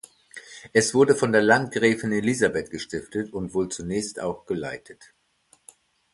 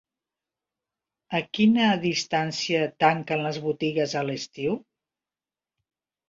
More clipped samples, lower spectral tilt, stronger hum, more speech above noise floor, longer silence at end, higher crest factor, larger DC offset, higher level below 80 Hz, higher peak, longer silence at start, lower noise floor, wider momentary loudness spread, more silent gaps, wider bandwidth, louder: neither; about the same, -4.5 dB/octave vs -5 dB/octave; neither; second, 39 dB vs over 66 dB; second, 1.2 s vs 1.5 s; about the same, 22 dB vs 20 dB; neither; first, -56 dBFS vs -68 dBFS; first, -2 dBFS vs -6 dBFS; second, 0.35 s vs 1.3 s; second, -63 dBFS vs under -90 dBFS; first, 17 LU vs 9 LU; neither; first, 11.5 kHz vs 7.6 kHz; about the same, -23 LUFS vs -25 LUFS